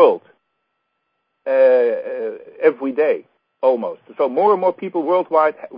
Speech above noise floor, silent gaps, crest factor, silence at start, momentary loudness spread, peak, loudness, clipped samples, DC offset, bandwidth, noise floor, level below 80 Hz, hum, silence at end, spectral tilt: 55 dB; none; 18 dB; 0 s; 13 LU; 0 dBFS; -18 LUFS; under 0.1%; under 0.1%; 5.2 kHz; -72 dBFS; -82 dBFS; none; 0 s; -10 dB/octave